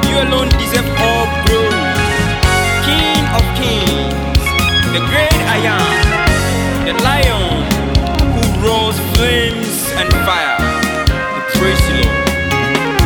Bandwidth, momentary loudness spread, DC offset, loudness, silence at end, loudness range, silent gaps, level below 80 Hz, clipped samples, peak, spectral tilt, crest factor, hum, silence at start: 19.5 kHz; 3 LU; under 0.1%; -13 LUFS; 0 s; 1 LU; none; -20 dBFS; under 0.1%; 0 dBFS; -4.5 dB/octave; 12 dB; none; 0 s